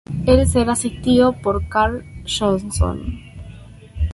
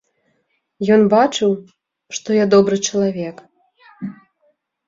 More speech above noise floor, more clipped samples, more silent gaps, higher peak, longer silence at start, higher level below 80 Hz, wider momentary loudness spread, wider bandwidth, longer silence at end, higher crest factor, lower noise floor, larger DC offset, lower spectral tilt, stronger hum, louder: second, 21 dB vs 52 dB; neither; neither; about the same, -2 dBFS vs -2 dBFS; second, 0.1 s vs 0.8 s; first, -28 dBFS vs -60 dBFS; about the same, 21 LU vs 19 LU; first, 11.5 kHz vs 7.8 kHz; second, 0 s vs 0.75 s; about the same, 16 dB vs 16 dB; second, -39 dBFS vs -67 dBFS; neither; about the same, -5.5 dB/octave vs -5 dB/octave; neither; about the same, -18 LUFS vs -16 LUFS